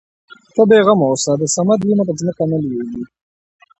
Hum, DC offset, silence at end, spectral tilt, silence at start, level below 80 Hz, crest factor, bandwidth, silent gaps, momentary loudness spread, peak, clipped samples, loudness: none; under 0.1%; 0.75 s; -5.5 dB/octave; 0.55 s; -56 dBFS; 16 dB; 8.8 kHz; none; 14 LU; 0 dBFS; under 0.1%; -15 LUFS